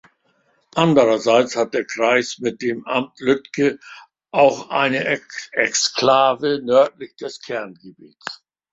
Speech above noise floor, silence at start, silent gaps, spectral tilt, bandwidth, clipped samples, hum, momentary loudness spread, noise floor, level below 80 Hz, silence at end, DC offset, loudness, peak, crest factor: 44 dB; 0.75 s; none; -4 dB/octave; 7.8 kHz; under 0.1%; none; 17 LU; -63 dBFS; -64 dBFS; 0.35 s; under 0.1%; -19 LUFS; -2 dBFS; 18 dB